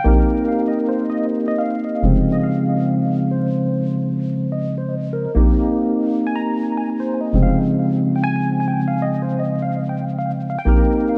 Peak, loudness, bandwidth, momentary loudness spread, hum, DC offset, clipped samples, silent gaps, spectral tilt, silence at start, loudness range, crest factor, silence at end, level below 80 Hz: -2 dBFS; -19 LUFS; 4 kHz; 7 LU; none; under 0.1%; under 0.1%; none; -11.5 dB/octave; 0 s; 2 LU; 16 dB; 0 s; -22 dBFS